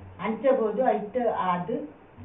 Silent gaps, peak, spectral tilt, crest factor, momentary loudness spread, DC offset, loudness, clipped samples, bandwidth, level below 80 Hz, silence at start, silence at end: none; -10 dBFS; -5.5 dB/octave; 16 dB; 9 LU; under 0.1%; -26 LUFS; under 0.1%; 3.9 kHz; -64 dBFS; 0 s; 0 s